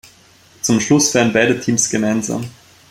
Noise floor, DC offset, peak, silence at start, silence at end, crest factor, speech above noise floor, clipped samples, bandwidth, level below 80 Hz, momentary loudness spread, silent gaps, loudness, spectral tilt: -48 dBFS; under 0.1%; -2 dBFS; 0.65 s; 0.4 s; 16 dB; 33 dB; under 0.1%; 16.5 kHz; -54 dBFS; 11 LU; none; -16 LUFS; -3.5 dB/octave